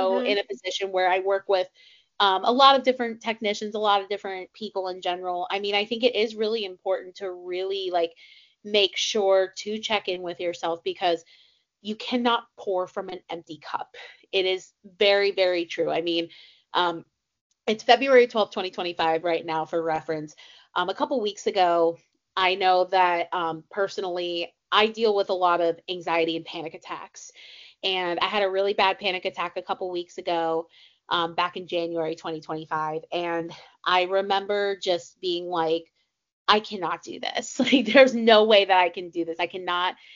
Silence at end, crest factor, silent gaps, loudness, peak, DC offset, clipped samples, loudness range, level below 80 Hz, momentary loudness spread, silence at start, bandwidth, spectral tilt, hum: 0 s; 24 dB; 17.41-17.50 s, 36.33-36.45 s; -24 LUFS; -2 dBFS; under 0.1%; under 0.1%; 6 LU; -72 dBFS; 13 LU; 0 s; 7.4 kHz; -0.5 dB/octave; none